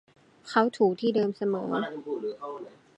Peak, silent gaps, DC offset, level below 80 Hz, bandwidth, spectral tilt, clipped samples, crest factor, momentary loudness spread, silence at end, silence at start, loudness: -8 dBFS; none; under 0.1%; -80 dBFS; 9.8 kHz; -6.5 dB/octave; under 0.1%; 20 dB; 14 LU; 0.3 s; 0.45 s; -28 LUFS